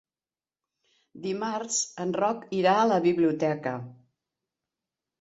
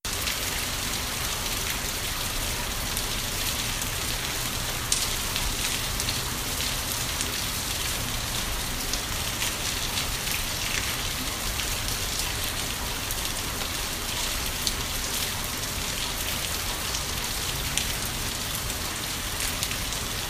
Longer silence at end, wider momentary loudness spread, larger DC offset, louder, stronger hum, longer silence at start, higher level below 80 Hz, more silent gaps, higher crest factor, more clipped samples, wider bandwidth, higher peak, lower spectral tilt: first, 1.3 s vs 0 s; first, 12 LU vs 2 LU; neither; about the same, -26 LUFS vs -27 LUFS; neither; first, 1.15 s vs 0.05 s; second, -72 dBFS vs -38 dBFS; neither; second, 20 dB vs 28 dB; neither; second, 8.4 kHz vs 15.5 kHz; second, -10 dBFS vs 0 dBFS; first, -4.5 dB/octave vs -1.5 dB/octave